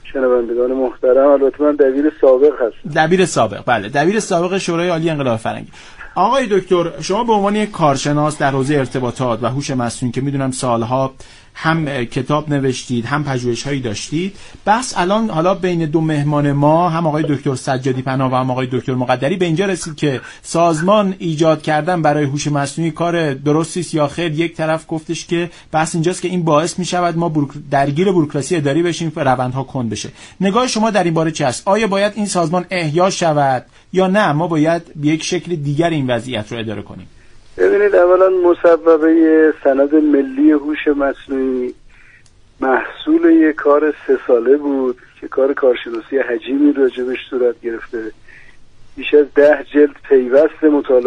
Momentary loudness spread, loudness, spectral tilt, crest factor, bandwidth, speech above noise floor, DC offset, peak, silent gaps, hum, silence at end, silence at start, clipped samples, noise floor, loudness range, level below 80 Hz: 9 LU; -16 LUFS; -6 dB/octave; 14 dB; 11 kHz; 31 dB; under 0.1%; 0 dBFS; none; none; 0 s; 0.05 s; under 0.1%; -46 dBFS; 5 LU; -46 dBFS